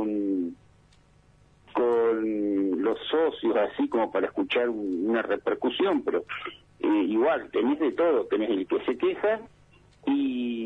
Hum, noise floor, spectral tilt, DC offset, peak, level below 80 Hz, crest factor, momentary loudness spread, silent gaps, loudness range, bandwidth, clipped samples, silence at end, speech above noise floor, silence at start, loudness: 50 Hz at -65 dBFS; -59 dBFS; -7 dB/octave; under 0.1%; -14 dBFS; -64 dBFS; 14 dB; 7 LU; none; 1 LU; 4.3 kHz; under 0.1%; 0 s; 33 dB; 0 s; -27 LUFS